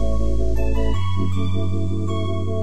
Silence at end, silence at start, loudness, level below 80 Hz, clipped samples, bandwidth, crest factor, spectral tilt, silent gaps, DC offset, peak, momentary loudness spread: 0 s; 0 s; -24 LUFS; -26 dBFS; under 0.1%; 9.2 kHz; 10 dB; -7.5 dB/octave; none; 10%; -8 dBFS; 1 LU